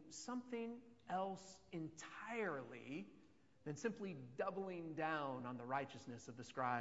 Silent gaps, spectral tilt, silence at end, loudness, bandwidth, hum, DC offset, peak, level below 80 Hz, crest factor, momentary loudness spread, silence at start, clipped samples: none; -4.5 dB/octave; 0 s; -48 LUFS; 7.6 kHz; none; under 0.1%; -28 dBFS; -84 dBFS; 20 dB; 11 LU; 0 s; under 0.1%